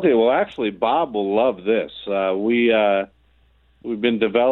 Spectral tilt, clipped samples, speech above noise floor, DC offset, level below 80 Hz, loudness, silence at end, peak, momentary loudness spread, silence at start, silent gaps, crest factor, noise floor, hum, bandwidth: -8 dB/octave; under 0.1%; 39 dB; under 0.1%; -58 dBFS; -20 LUFS; 0 s; -4 dBFS; 8 LU; 0 s; none; 16 dB; -58 dBFS; none; 4.2 kHz